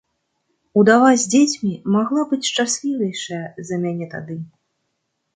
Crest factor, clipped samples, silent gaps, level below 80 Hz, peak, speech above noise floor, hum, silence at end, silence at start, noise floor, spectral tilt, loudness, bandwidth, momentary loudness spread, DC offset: 18 dB; under 0.1%; none; -66 dBFS; -2 dBFS; 56 dB; none; 0.9 s; 0.75 s; -74 dBFS; -4 dB/octave; -18 LUFS; 9.6 kHz; 16 LU; under 0.1%